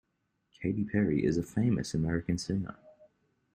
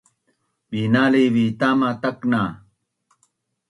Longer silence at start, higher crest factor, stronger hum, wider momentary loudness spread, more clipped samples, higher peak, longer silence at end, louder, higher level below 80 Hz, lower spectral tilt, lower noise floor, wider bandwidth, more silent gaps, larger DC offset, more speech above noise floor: about the same, 0.6 s vs 0.7 s; about the same, 18 dB vs 18 dB; neither; second, 7 LU vs 10 LU; neither; second, -14 dBFS vs -4 dBFS; second, 0.65 s vs 1.15 s; second, -31 LUFS vs -20 LUFS; first, -54 dBFS vs -60 dBFS; about the same, -7 dB/octave vs -7.5 dB/octave; first, -79 dBFS vs -70 dBFS; first, 13.5 kHz vs 11 kHz; neither; neither; about the same, 49 dB vs 51 dB